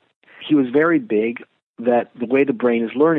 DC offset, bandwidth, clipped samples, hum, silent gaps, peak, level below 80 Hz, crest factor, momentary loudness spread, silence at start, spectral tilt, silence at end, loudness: under 0.1%; 4 kHz; under 0.1%; none; 1.63-1.74 s; -4 dBFS; -74 dBFS; 14 dB; 8 LU; 0.4 s; -9.5 dB/octave; 0 s; -19 LUFS